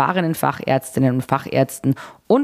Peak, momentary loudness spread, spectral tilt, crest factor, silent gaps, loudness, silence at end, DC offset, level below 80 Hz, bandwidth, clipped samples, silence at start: -2 dBFS; 4 LU; -6.5 dB/octave; 18 dB; none; -20 LUFS; 0 s; under 0.1%; -58 dBFS; 16 kHz; under 0.1%; 0 s